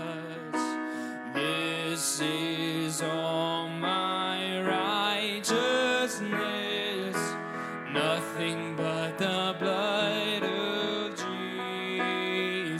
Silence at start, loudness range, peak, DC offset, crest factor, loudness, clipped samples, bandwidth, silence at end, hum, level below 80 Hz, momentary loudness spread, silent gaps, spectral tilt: 0 s; 2 LU; -14 dBFS; under 0.1%; 16 dB; -30 LUFS; under 0.1%; 16 kHz; 0 s; none; -80 dBFS; 7 LU; none; -3.5 dB/octave